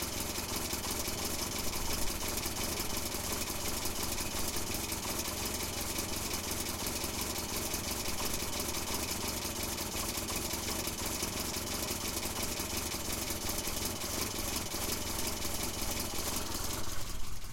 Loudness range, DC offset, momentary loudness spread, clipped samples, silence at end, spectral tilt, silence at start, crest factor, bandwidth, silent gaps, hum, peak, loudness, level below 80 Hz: 0 LU; under 0.1%; 1 LU; under 0.1%; 0 s; -2.5 dB/octave; 0 s; 18 dB; 17 kHz; none; none; -18 dBFS; -35 LUFS; -46 dBFS